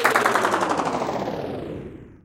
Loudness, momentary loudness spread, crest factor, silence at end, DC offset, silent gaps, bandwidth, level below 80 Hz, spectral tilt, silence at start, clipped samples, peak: -23 LUFS; 16 LU; 20 dB; 0.1 s; under 0.1%; none; 17 kHz; -52 dBFS; -4 dB/octave; 0 s; under 0.1%; -2 dBFS